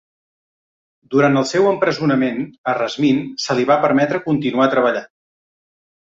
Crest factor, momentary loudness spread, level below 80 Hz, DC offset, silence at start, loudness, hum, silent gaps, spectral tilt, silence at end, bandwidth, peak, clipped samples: 16 dB; 6 LU; -60 dBFS; under 0.1%; 1.1 s; -17 LUFS; none; 2.58-2.64 s; -5.5 dB/octave; 1.05 s; 7.8 kHz; -2 dBFS; under 0.1%